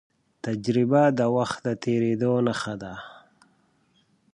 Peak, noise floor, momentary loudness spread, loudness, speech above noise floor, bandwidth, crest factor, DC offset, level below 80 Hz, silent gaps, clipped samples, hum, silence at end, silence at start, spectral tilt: -6 dBFS; -65 dBFS; 17 LU; -24 LUFS; 42 dB; 10.5 kHz; 18 dB; under 0.1%; -64 dBFS; none; under 0.1%; none; 1.2 s; 0.45 s; -7 dB/octave